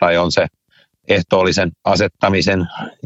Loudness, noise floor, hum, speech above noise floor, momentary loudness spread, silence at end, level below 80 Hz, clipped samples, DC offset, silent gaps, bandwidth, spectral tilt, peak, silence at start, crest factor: -16 LUFS; -57 dBFS; none; 41 dB; 6 LU; 0.15 s; -44 dBFS; under 0.1%; under 0.1%; none; 8.2 kHz; -5 dB/octave; 0 dBFS; 0 s; 16 dB